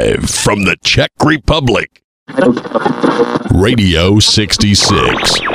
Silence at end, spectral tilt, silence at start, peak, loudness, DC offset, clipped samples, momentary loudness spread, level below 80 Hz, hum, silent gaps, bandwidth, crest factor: 0 s; -4 dB/octave; 0 s; 0 dBFS; -11 LUFS; under 0.1%; under 0.1%; 6 LU; -26 dBFS; none; 2.04-2.26 s; 16 kHz; 12 dB